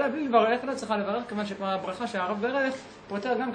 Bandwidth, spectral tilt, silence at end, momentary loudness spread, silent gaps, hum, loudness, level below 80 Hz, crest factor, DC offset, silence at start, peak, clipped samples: 10 kHz; -5.5 dB/octave; 0 s; 10 LU; none; none; -28 LUFS; -68 dBFS; 20 dB; under 0.1%; 0 s; -8 dBFS; under 0.1%